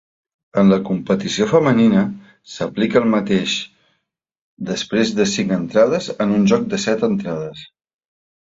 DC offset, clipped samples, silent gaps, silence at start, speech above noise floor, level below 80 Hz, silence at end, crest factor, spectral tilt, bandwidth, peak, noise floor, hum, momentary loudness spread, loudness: under 0.1%; under 0.1%; 4.41-4.57 s; 0.55 s; 54 dB; -54 dBFS; 0.85 s; 18 dB; -5.5 dB/octave; 7.8 kHz; -2 dBFS; -71 dBFS; none; 12 LU; -18 LUFS